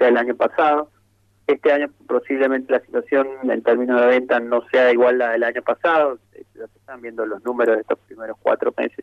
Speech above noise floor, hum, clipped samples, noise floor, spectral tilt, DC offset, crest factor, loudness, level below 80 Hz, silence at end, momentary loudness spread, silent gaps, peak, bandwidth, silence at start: 41 dB; none; under 0.1%; -60 dBFS; -6 dB/octave; under 0.1%; 14 dB; -19 LUFS; -70 dBFS; 0 s; 16 LU; none; -6 dBFS; 6.2 kHz; 0 s